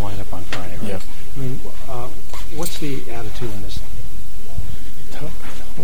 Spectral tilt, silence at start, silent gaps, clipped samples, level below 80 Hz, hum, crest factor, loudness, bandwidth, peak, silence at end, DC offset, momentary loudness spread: -5 dB/octave; 0 s; none; under 0.1%; -34 dBFS; none; 20 dB; -31 LUFS; 19 kHz; -2 dBFS; 0 s; 40%; 8 LU